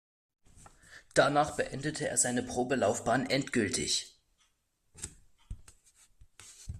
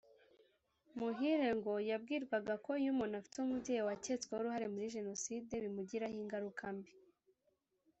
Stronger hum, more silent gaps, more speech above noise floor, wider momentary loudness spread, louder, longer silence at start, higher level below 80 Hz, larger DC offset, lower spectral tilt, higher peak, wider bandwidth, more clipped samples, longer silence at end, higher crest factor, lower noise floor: neither; neither; about the same, 44 dB vs 42 dB; first, 23 LU vs 7 LU; first, -30 LUFS vs -41 LUFS; about the same, 0.9 s vs 0.95 s; first, -56 dBFS vs -76 dBFS; neither; second, -3 dB/octave vs -4.5 dB/octave; first, -10 dBFS vs -24 dBFS; first, 14 kHz vs 8.2 kHz; neither; second, 0 s vs 1 s; first, 24 dB vs 16 dB; second, -74 dBFS vs -82 dBFS